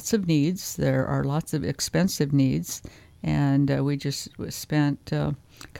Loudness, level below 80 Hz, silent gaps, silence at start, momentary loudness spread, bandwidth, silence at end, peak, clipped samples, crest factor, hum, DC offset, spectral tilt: -25 LUFS; -50 dBFS; none; 0 s; 11 LU; 17 kHz; 0 s; -8 dBFS; under 0.1%; 16 dB; none; under 0.1%; -6 dB/octave